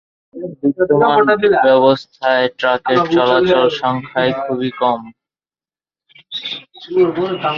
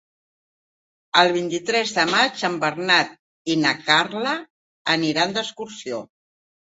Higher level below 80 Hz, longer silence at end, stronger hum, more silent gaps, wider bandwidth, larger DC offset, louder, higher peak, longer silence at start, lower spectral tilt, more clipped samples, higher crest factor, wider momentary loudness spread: first, -54 dBFS vs -68 dBFS; second, 0 s vs 0.65 s; neither; second, none vs 3.19-3.45 s, 4.50-4.85 s; second, 7 kHz vs 8 kHz; neither; first, -15 LUFS vs -20 LUFS; about the same, -2 dBFS vs -2 dBFS; second, 0.35 s vs 1.15 s; first, -6.5 dB/octave vs -3 dB/octave; neither; second, 14 dB vs 22 dB; about the same, 13 LU vs 13 LU